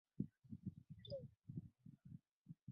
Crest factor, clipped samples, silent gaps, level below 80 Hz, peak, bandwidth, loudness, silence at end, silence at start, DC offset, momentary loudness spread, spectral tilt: 24 dB; under 0.1%; 2.31-2.45 s, 2.63-2.67 s; -74 dBFS; -30 dBFS; 4.9 kHz; -56 LUFS; 0 s; 0.2 s; under 0.1%; 12 LU; -9.5 dB/octave